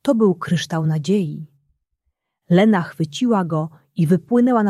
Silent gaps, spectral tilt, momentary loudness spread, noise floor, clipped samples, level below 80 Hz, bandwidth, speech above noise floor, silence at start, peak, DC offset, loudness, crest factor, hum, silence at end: none; -7 dB/octave; 9 LU; -74 dBFS; under 0.1%; -62 dBFS; 13 kHz; 57 dB; 0.05 s; -4 dBFS; under 0.1%; -19 LUFS; 16 dB; none; 0 s